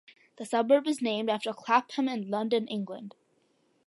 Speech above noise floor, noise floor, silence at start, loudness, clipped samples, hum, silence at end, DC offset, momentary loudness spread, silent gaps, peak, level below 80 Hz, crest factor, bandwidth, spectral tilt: 41 dB; -70 dBFS; 0.4 s; -29 LUFS; under 0.1%; none; 0.75 s; under 0.1%; 15 LU; none; -10 dBFS; -84 dBFS; 20 dB; 11.5 kHz; -5 dB/octave